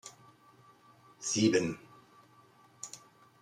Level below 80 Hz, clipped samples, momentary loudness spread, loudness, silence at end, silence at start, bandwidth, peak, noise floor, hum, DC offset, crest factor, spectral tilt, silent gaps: -76 dBFS; under 0.1%; 22 LU; -31 LUFS; 0.45 s; 0.05 s; 13.5 kHz; -14 dBFS; -62 dBFS; none; under 0.1%; 22 dB; -4 dB/octave; none